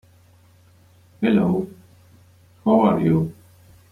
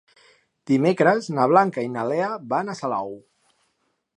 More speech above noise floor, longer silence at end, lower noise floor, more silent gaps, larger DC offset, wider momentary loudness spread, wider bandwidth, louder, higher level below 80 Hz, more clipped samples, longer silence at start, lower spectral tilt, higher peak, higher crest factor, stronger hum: second, 35 dB vs 50 dB; second, 0.6 s vs 1 s; second, -53 dBFS vs -72 dBFS; neither; neither; about the same, 11 LU vs 10 LU; about the same, 11.5 kHz vs 10.5 kHz; about the same, -20 LUFS vs -22 LUFS; first, -56 dBFS vs -74 dBFS; neither; first, 1.2 s vs 0.65 s; first, -9 dB/octave vs -7 dB/octave; about the same, -4 dBFS vs -2 dBFS; about the same, 18 dB vs 22 dB; neither